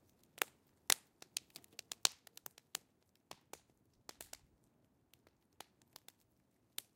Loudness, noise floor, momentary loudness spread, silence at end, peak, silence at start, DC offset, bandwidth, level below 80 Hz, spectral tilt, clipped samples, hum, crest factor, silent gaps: -41 LUFS; -77 dBFS; 25 LU; 0.15 s; -8 dBFS; 0.4 s; under 0.1%; 17 kHz; -84 dBFS; 1.5 dB/octave; under 0.1%; none; 40 dB; none